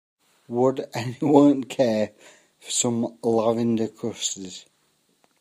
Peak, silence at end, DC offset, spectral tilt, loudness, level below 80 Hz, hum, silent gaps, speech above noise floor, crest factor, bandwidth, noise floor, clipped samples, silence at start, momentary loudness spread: -2 dBFS; 0.8 s; under 0.1%; -5 dB/octave; -23 LUFS; -68 dBFS; none; none; 44 dB; 22 dB; 15.5 kHz; -67 dBFS; under 0.1%; 0.5 s; 14 LU